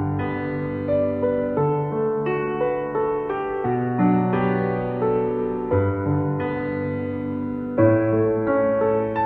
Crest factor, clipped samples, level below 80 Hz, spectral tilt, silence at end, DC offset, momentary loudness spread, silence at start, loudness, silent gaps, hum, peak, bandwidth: 16 dB; under 0.1%; -50 dBFS; -11 dB/octave; 0 s; under 0.1%; 7 LU; 0 s; -22 LUFS; none; none; -6 dBFS; 4.6 kHz